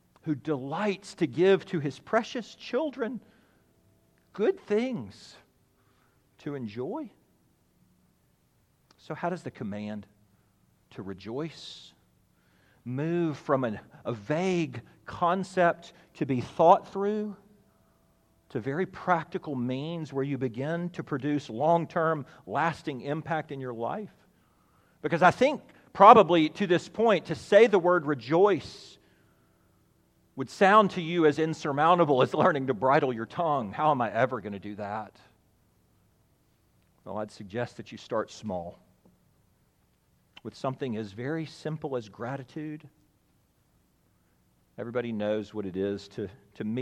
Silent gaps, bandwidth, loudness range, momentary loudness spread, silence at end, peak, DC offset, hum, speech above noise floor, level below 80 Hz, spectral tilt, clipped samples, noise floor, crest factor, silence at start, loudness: none; 11 kHz; 17 LU; 17 LU; 0 s; -2 dBFS; under 0.1%; none; 41 dB; -70 dBFS; -6.5 dB/octave; under 0.1%; -68 dBFS; 26 dB; 0.25 s; -27 LUFS